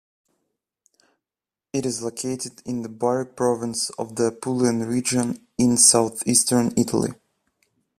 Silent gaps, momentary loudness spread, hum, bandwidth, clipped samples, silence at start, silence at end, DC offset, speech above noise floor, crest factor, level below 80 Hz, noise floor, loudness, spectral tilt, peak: none; 15 LU; none; 15 kHz; under 0.1%; 1.75 s; 0.85 s; under 0.1%; over 68 dB; 22 dB; -60 dBFS; under -90 dBFS; -21 LUFS; -3.5 dB/octave; 0 dBFS